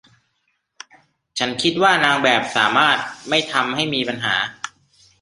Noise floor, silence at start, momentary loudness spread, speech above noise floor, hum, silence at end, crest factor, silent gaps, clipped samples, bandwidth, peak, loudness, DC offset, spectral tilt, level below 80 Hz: -70 dBFS; 1.35 s; 10 LU; 51 dB; none; 0.55 s; 20 dB; none; under 0.1%; 11.5 kHz; 0 dBFS; -18 LUFS; under 0.1%; -3 dB/octave; -62 dBFS